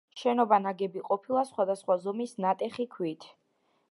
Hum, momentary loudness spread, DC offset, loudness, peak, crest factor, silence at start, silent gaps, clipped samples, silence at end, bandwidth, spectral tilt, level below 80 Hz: none; 10 LU; under 0.1%; -30 LUFS; -10 dBFS; 20 dB; 0.15 s; none; under 0.1%; 0.65 s; 11.5 kHz; -6 dB/octave; -84 dBFS